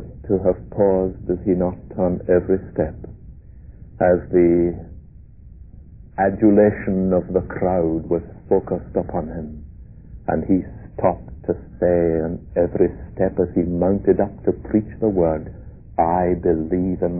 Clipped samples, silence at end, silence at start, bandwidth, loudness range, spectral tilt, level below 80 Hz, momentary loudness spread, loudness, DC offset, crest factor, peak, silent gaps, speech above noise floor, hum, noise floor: under 0.1%; 0 s; 0 s; 2.7 kHz; 4 LU; -16 dB/octave; -38 dBFS; 11 LU; -20 LUFS; 0.2%; 16 dB; -4 dBFS; none; 23 dB; none; -43 dBFS